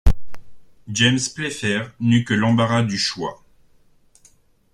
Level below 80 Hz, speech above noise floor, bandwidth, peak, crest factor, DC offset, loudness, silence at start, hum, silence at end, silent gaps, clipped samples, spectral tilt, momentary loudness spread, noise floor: -30 dBFS; 35 dB; 12 kHz; -2 dBFS; 18 dB; under 0.1%; -20 LUFS; 0.05 s; none; 1.4 s; none; under 0.1%; -4.5 dB/octave; 11 LU; -55 dBFS